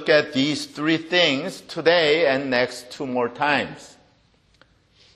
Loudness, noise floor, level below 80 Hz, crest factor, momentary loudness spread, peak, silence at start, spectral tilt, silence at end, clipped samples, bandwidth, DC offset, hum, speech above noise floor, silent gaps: -21 LUFS; -60 dBFS; -64 dBFS; 20 dB; 11 LU; -2 dBFS; 0 s; -4 dB/octave; 1.3 s; under 0.1%; 13 kHz; under 0.1%; none; 39 dB; none